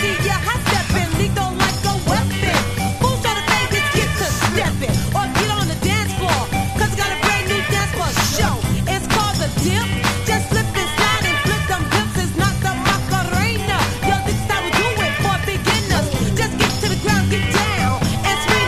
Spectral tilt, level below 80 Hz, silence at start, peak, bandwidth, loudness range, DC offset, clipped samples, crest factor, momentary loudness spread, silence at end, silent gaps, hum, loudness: -4 dB/octave; -30 dBFS; 0 s; 0 dBFS; 15.5 kHz; 1 LU; under 0.1%; under 0.1%; 18 dB; 3 LU; 0 s; none; none; -18 LUFS